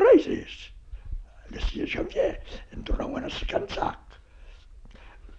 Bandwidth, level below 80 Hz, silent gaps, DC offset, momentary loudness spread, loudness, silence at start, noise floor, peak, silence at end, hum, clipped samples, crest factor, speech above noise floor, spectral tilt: 8 kHz; -38 dBFS; none; under 0.1%; 17 LU; -28 LUFS; 0 s; -48 dBFS; -8 dBFS; 0 s; none; under 0.1%; 20 dB; 19 dB; -6 dB/octave